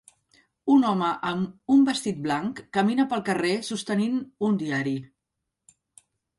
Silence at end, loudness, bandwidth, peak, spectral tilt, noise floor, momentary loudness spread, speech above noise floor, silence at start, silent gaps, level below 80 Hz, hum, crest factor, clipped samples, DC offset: 1.35 s; -25 LUFS; 11.5 kHz; -8 dBFS; -5.5 dB/octave; -83 dBFS; 8 LU; 59 dB; 0.65 s; none; -66 dBFS; none; 16 dB; under 0.1%; under 0.1%